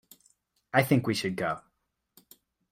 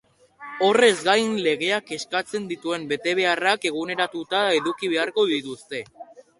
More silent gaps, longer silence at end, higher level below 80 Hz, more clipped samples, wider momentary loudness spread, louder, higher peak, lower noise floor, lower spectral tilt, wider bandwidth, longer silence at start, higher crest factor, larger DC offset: neither; first, 1.1 s vs 0.35 s; about the same, -66 dBFS vs -70 dBFS; neither; second, 9 LU vs 15 LU; second, -28 LUFS vs -22 LUFS; second, -8 dBFS vs -4 dBFS; first, -78 dBFS vs -44 dBFS; first, -5.5 dB/octave vs -3 dB/octave; first, 16 kHz vs 11.5 kHz; first, 0.75 s vs 0.4 s; about the same, 24 dB vs 20 dB; neither